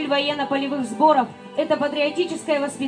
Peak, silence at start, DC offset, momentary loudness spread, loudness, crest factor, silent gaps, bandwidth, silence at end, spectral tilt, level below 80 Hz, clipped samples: -6 dBFS; 0 s; under 0.1%; 8 LU; -22 LUFS; 16 dB; none; 10 kHz; 0 s; -4 dB/octave; -76 dBFS; under 0.1%